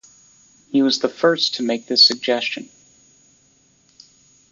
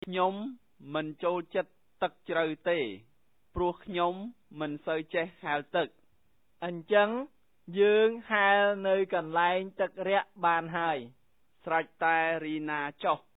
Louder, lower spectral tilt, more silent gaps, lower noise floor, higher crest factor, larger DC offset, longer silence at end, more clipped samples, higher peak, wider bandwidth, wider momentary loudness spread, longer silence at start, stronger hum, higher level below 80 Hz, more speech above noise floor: first, -17 LUFS vs -30 LUFS; second, -3 dB/octave vs -8 dB/octave; neither; second, -58 dBFS vs -74 dBFS; about the same, 20 dB vs 20 dB; neither; first, 1.85 s vs 0.2 s; neither; first, -2 dBFS vs -12 dBFS; first, 7.6 kHz vs 4 kHz; about the same, 11 LU vs 13 LU; first, 0.75 s vs 0.05 s; neither; second, -70 dBFS vs -62 dBFS; second, 39 dB vs 44 dB